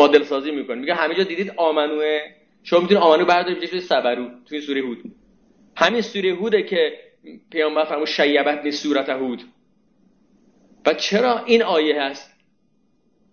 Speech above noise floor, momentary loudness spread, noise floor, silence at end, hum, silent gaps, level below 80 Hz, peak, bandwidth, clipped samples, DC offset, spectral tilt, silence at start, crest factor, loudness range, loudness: 45 dB; 13 LU; -65 dBFS; 1.1 s; none; none; -68 dBFS; -2 dBFS; 7 kHz; under 0.1%; under 0.1%; -4.5 dB/octave; 0 s; 20 dB; 4 LU; -20 LUFS